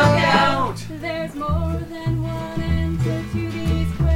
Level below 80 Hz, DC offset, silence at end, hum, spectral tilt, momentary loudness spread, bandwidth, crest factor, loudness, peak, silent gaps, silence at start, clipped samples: -30 dBFS; under 0.1%; 0 s; none; -6.5 dB/octave; 11 LU; 16 kHz; 18 dB; -22 LUFS; -2 dBFS; none; 0 s; under 0.1%